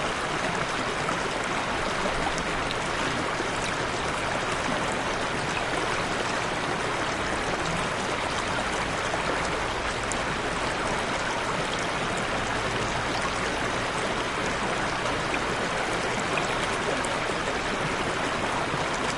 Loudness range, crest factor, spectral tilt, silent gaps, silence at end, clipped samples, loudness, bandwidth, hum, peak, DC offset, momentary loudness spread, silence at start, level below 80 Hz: 1 LU; 16 dB; -3.5 dB/octave; none; 0 s; under 0.1%; -27 LUFS; 11.5 kHz; none; -12 dBFS; under 0.1%; 1 LU; 0 s; -44 dBFS